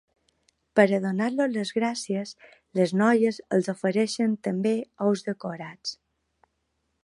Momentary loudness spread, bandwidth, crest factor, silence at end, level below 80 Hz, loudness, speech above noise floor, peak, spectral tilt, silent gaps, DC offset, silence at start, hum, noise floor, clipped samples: 13 LU; 11.5 kHz; 22 dB; 1.1 s; -74 dBFS; -26 LUFS; 51 dB; -4 dBFS; -5.5 dB/octave; none; under 0.1%; 0.75 s; none; -76 dBFS; under 0.1%